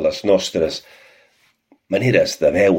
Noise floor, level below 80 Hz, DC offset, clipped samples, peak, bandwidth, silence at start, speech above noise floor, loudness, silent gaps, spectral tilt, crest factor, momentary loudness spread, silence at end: -59 dBFS; -50 dBFS; under 0.1%; under 0.1%; -2 dBFS; 16.5 kHz; 0 s; 42 dB; -18 LUFS; none; -5 dB/octave; 18 dB; 8 LU; 0 s